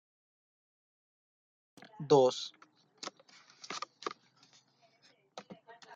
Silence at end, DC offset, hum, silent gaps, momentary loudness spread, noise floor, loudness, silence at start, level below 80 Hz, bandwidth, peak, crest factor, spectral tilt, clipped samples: 0 s; under 0.1%; none; none; 27 LU; -68 dBFS; -33 LUFS; 2 s; -84 dBFS; 9 kHz; -14 dBFS; 24 dB; -5 dB/octave; under 0.1%